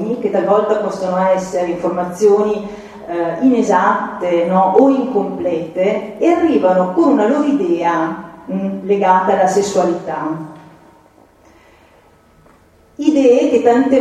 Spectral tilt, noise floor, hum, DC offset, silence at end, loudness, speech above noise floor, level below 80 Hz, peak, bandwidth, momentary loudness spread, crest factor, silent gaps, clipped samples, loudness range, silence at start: -6.5 dB/octave; -49 dBFS; none; under 0.1%; 0 s; -15 LUFS; 35 dB; -56 dBFS; 0 dBFS; 12 kHz; 10 LU; 16 dB; none; under 0.1%; 5 LU; 0 s